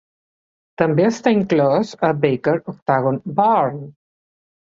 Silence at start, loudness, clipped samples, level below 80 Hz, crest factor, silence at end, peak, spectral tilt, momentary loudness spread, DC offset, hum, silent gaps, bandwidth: 0.8 s; -18 LUFS; under 0.1%; -58 dBFS; 18 dB; 0.8 s; -2 dBFS; -7 dB/octave; 5 LU; under 0.1%; none; 2.82-2.86 s; 7.8 kHz